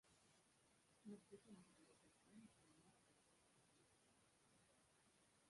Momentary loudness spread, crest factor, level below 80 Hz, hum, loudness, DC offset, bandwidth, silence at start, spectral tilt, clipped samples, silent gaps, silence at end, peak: 6 LU; 22 dB; under -90 dBFS; none; -66 LUFS; under 0.1%; 11.5 kHz; 0.05 s; -4.5 dB/octave; under 0.1%; none; 0 s; -48 dBFS